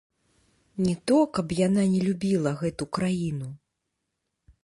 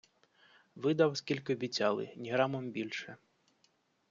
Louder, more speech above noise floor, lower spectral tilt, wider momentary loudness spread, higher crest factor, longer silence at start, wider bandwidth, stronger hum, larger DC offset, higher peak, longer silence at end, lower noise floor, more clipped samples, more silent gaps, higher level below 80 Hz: first, -26 LUFS vs -34 LUFS; first, 56 dB vs 40 dB; first, -7 dB/octave vs -4 dB/octave; about the same, 9 LU vs 10 LU; second, 16 dB vs 22 dB; about the same, 0.75 s vs 0.75 s; first, 11.5 kHz vs 7.6 kHz; neither; neither; first, -10 dBFS vs -14 dBFS; about the same, 1.05 s vs 0.95 s; first, -81 dBFS vs -74 dBFS; neither; neither; first, -58 dBFS vs -80 dBFS